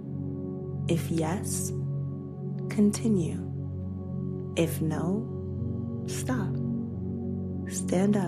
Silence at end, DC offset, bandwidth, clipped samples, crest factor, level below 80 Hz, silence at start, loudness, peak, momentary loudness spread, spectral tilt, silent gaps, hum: 0 s; under 0.1%; 14.5 kHz; under 0.1%; 18 dB; -70 dBFS; 0 s; -31 LUFS; -12 dBFS; 9 LU; -6.5 dB/octave; none; none